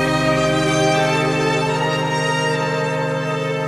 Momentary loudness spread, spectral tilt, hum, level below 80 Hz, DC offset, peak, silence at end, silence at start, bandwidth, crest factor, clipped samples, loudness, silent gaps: 5 LU; -5 dB/octave; none; -44 dBFS; under 0.1%; -6 dBFS; 0 s; 0 s; 13.5 kHz; 12 dB; under 0.1%; -18 LUFS; none